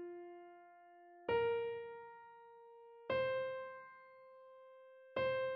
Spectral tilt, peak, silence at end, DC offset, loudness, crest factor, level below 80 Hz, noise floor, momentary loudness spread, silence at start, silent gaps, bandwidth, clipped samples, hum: -2.5 dB/octave; -26 dBFS; 0 s; under 0.1%; -41 LUFS; 16 dB; -76 dBFS; -62 dBFS; 23 LU; 0 s; none; 5.8 kHz; under 0.1%; none